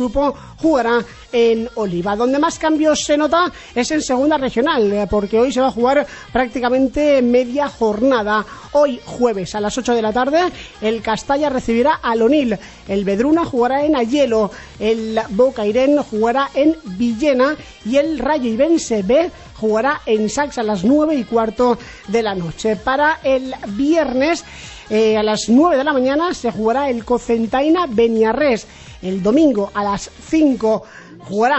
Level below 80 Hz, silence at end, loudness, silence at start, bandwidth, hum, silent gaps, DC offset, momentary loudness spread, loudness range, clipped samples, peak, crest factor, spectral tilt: -42 dBFS; 0 s; -17 LUFS; 0 s; 8.4 kHz; none; none; under 0.1%; 7 LU; 2 LU; under 0.1%; -2 dBFS; 14 dB; -5 dB/octave